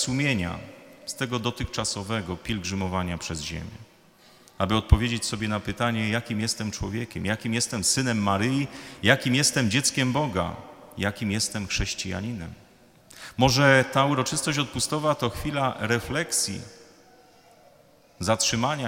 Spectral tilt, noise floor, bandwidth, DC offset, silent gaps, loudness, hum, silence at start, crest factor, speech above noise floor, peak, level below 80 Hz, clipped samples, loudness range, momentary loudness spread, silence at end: -4 dB/octave; -56 dBFS; 17 kHz; under 0.1%; none; -25 LUFS; none; 0 s; 26 dB; 31 dB; 0 dBFS; -40 dBFS; under 0.1%; 7 LU; 12 LU; 0 s